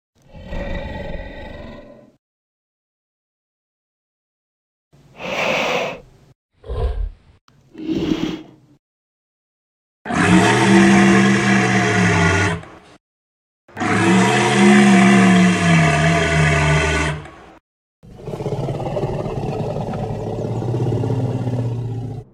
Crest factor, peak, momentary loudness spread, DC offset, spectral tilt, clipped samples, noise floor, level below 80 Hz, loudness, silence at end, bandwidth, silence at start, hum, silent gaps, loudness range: 18 dB; 0 dBFS; 20 LU; under 0.1%; -5.5 dB/octave; under 0.1%; -40 dBFS; -36 dBFS; -16 LUFS; 0.1 s; 12 kHz; 0.35 s; none; 2.19-4.91 s, 6.35-6.49 s, 7.41-7.48 s, 8.79-10.05 s, 13.00-13.68 s, 17.60-18.03 s; 14 LU